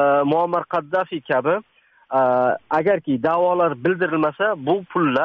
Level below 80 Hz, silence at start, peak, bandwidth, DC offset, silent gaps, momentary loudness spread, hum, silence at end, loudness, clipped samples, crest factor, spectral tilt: -64 dBFS; 0 s; -6 dBFS; 6 kHz; under 0.1%; none; 5 LU; none; 0 s; -20 LUFS; under 0.1%; 12 dB; -4.5 dB/octave